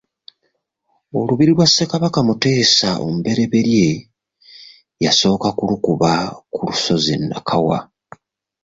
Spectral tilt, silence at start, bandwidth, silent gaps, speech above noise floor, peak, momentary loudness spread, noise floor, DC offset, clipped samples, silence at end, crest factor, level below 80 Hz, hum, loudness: -4.5 dB/octave; 1.15 s; 7.8 kHz; none; 53 dB; -2 dBFS; 9 LU; -69 dBFS; under 0.1%; under 0.1%; 0.8 s; 16 dB; -50 dBFS; none; -16 LUFS